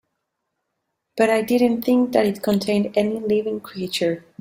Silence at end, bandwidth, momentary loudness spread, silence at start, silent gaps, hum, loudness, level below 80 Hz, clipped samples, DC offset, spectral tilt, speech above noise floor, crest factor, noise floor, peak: 0.2 s; 16 kHz; 8 LU; 1.15 s; none; none; -21 LUFS; -62 dBFS; under 0.1%; under 0.1%; -5.5 dB/octave; 57 dB; 18 dB; -77 dBFS; -4 dBFS